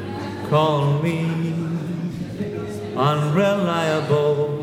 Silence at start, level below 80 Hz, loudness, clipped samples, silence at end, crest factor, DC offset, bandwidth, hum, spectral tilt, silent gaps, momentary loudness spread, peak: 0 s; -56 dBFS; -21 LUFS; under 0.1%; 0 s; 16 dB; under 0.1%; 14.5 kHz; none; -7 dB/octave; none; 10 LU; -6 dBFS